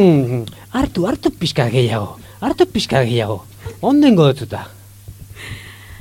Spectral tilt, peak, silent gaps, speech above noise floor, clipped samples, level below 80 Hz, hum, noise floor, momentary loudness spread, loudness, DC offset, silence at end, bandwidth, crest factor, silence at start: -6.5 dB/octave; -2 dBFS; none; 22 dB; under 0.1%; -40 dBFS; none; -37 dBFS; 21 LU; -17 LUFS; under 0.1%; 0 s; 16.5 kHz; 16 dB; 0 s